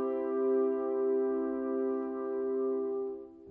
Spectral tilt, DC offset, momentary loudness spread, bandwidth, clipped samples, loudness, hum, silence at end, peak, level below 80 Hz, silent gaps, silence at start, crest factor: -9.5 dB/octave; under 0.1%; 6 LU; 2.9 kHz; under 0.1%; -32 LUFS; none; 0 s; -20 dBFS; -72 dBFS; none; 0 s; 12 dB